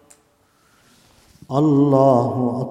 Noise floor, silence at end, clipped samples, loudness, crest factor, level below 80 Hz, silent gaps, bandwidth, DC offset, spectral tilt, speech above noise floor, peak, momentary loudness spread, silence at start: -59 dBFS; 0 s; under 0.1%; -17 LUFS; 18 dB; -60 dBFS; none; 10.5 kHz; under 0.1%; -9.5 dB/octave; 43 dB; -2 dBFS; 8 LU; 1.5 s